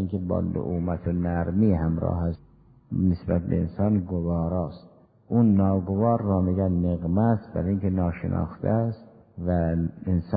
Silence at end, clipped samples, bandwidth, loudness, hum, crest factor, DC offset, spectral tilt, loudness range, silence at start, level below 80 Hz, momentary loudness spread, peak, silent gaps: 0 s; under 0.1%; 4.9 kHz; -25 LUFS; none; 16 dB; under 0.1%; -14 dB/octave; 3 LU; 0 s; -38 dBFS; 6 LU; -8 dBFS; none